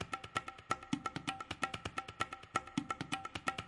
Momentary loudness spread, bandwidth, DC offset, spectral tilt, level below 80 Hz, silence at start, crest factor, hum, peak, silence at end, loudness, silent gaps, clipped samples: 3 LU; 11.5 kHz; under 0.1%; -3.5 dB/octave; -66 dBFS; 0 s; 22 dB; none; -20 dBFS; 0 s; -41 LUFS; none; under 0.1%